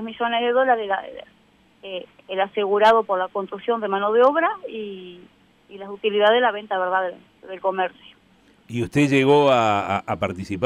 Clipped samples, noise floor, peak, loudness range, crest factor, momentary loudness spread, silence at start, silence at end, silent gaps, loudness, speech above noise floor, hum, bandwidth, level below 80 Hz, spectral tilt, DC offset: under 0.1%; -56 dBFS; -6 dBFS; 3 LU; 16 dB; 18 LU; 0 s; 0 s; none; -21 LUFS; 35 dB; none; 11.5 kHz; -60 dBFS; -6 dB/octave; under 0.1%